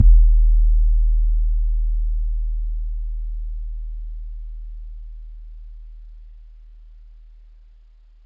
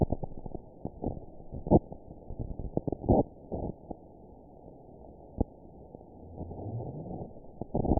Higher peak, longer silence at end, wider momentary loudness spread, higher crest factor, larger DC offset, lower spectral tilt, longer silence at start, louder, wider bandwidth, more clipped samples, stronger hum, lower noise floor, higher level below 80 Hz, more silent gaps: first, -2 dBFS vs -10 dBFS; first, 1.35 s vs 0 s; about the same, 23 LU vs 24 LU; second, 16 dB vs 24 dB; neither; first, -12 dB/octave vs -5 dB/octave; about the same, 0 s vs 0 s; first, -23 LUFS vs -34 LUFS; second, 0.3 kHz vs 1 kHz; neither; neither; second, -48 dBFS vs -52 dBFS; first, -20 dBFS vs -42 dBFS; neither